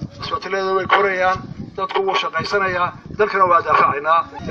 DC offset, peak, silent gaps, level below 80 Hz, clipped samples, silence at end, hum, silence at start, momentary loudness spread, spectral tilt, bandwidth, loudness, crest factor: under 0.1%; 0 dBFS; none; -48 dBFS; under 0.1%; 0 s; none; 0 s; 11 LU; -5 dB/octave; 7.4 kHz; -18 LUFS; 18 dB